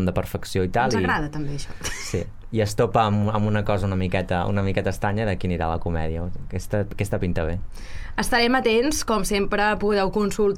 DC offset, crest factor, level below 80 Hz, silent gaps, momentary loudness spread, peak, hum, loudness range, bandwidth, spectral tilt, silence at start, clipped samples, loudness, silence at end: under 0.1%; 16 dB; -34 dBFS; none; 11 LU; -6 dBFS; none; 4 LU; 16 kHz; -5.5 dB/octave; 0 s; under 0.1%; -24 LUFS; 0 s